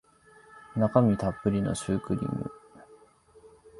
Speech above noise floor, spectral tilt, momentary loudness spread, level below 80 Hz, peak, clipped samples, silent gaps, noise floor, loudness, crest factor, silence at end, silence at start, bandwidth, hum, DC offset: 31 dB; -7.5 dB/octave; 13 LU; -52 dBFS; -6 dBFS; under 0.1%; none; -57 dBFS; -28 LUFS; 24 dB; 0 s; 0.55 s; 11.5 kHz; none; under 0.1%